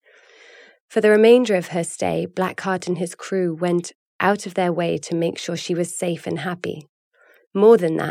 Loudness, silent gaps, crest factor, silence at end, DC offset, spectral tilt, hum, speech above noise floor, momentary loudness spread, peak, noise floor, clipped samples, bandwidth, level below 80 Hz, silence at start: -20 LUFS; 3.95-4.19 s, 6.89-7.11 s, 7.47-7.51 s; 18 dB; 0 s; under 0.1%; -5.5 dB/octave; none; 31 dB; 13 LU; -4 dBFS; -50 dBFS; under 0.1%; 15 kHz; -70 dBFS; 0.9 s